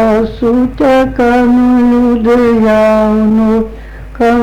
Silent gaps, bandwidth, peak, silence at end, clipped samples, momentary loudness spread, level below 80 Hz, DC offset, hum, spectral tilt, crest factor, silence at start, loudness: none; 9.4 kHz; -4 dBFS; 0 s; under 0.1%; 6 LU; -28 dBFS; under 0.1%; none; -7.5 dB/octave; 6 dB; 0 s; -9 LUFS